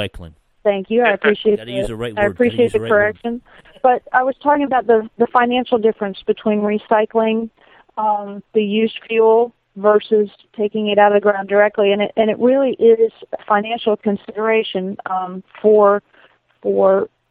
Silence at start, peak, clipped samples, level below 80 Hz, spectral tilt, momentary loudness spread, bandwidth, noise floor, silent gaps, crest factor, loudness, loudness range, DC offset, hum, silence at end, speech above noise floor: 0 s; 0 dBFS; under 0.1%; -50 dBFS; -7 dB/octave; 10 LU; 9.6 kHz; -52 dBFS; none; 16 dB; -17 LUFS; 3 LU; under 0.1%; none; 0.25 s; 36 dB